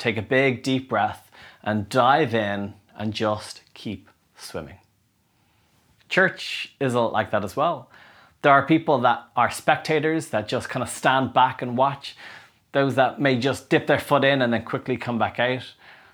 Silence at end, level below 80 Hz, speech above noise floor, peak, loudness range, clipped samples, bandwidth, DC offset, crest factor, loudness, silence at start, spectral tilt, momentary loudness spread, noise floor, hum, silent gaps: 0.2 s; -62 dBFS; 43 dB; -2 dBFS; 7 LU; under 0.1%; over 20 kHz; under 0.1%; 22 dB; -22 LUFS; 0 s; -5.5 dB/octave; 17 LU; -66 dBFS; none; none